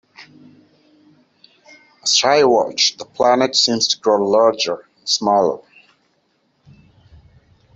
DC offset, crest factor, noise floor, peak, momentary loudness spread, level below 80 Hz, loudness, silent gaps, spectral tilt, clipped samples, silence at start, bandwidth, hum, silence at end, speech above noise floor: under 0.1%; 18 dB; -64 dBFS; -2 dBFS; 9 LU; -62 dBFS; -16 LUFS; none; -2 dB/octave; under 0.1%; 0.2 s; 8.2 kHz; none; 2.2 s; 48 dB